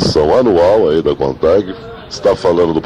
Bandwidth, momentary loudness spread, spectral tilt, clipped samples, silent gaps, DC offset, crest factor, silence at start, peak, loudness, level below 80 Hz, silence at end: 11 kHz; 12 LU; -6 dB/octave; under 0.1%; none; under 0.1%; 12 dB; 0 s; 0 dBFS; -12 LUFS; -36 dBFS; 0 s